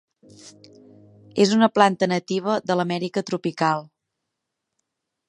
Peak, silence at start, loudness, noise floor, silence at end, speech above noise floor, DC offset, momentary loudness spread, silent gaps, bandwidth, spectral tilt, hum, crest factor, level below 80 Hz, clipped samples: -2 dBFS; 0.45 s; -22 LUFS; -81 dBFS; 1.45 s; 60 dB; under 0.1%; 9 LU; none; 11 kHz; -5.5 dB/octave; none; 22 dB; -72 dBFS; under 0.1%